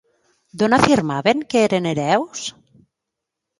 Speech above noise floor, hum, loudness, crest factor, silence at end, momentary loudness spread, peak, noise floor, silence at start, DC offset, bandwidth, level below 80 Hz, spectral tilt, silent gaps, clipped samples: 64 dB; none; -18 LUFS; 20 dB; 1.1 s; 12 LU; 0 dBFS; -82 dBFS; 0.55 s; under 0.1%; 11.5 kHz; -52 dBFS; -5 dB/octave; none; under 0.1%